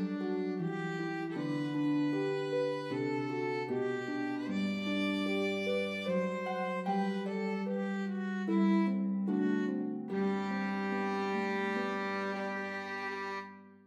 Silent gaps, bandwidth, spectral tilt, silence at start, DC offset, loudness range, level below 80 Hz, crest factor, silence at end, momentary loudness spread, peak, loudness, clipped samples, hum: none; 11 kHz; -7 dB/octave; 0 s; under 0.1%; 2 LU; -86 dBFS; 14 dB; 0.1 s; 5 LU; -20 dBFS; -34 LUFS; under 0.1%; none